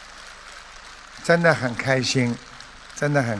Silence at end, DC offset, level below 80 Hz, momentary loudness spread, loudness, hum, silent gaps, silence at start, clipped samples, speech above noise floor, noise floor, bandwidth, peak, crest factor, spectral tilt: 0 s; under 0.1%; -52 dBFS; 22 LU; -21 LUFS; none; none; 0 s; under 0.1%; 22 dB; -42 dBFS; 11 kHz; -2 dBFS; 22 dB; -5 dB/octave